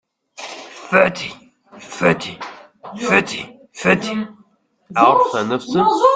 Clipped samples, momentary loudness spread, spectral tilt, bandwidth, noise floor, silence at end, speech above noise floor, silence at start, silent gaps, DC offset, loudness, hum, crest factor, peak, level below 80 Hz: under 0.1%; 20 LU; -5 dB/octave; 9.4 kHz; -55 dBFS; 0 s; 39 dB; 0.4 s; none; under 0.1%; -17 LUFS; none; 18 dB; 0 dBFS; -58 dBFS